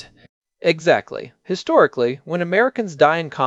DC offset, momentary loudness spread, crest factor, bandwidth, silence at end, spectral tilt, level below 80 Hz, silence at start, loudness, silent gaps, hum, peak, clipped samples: under 0.1%; 11 LU; 18 dB; 8 kHz; 0 s; -5.5 dB/octave; -66 dBFS; 0.65 s; -18 LUFS; none; none; -2 dBFS; under 0.1%